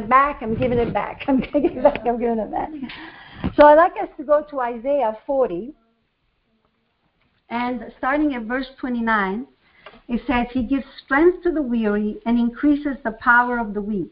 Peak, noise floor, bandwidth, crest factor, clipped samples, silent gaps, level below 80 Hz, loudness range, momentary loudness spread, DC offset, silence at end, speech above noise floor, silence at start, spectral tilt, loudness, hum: 0 dBFS; -68 dBFS; 5.4 kHz; 20 dB; under 0.1%; none; -44 dBFS; 8 LU; 12 LU; under 0.1%; 0.05 s; 48 dB; 0 s; -10.5 dB/octave; -20 LUFS; none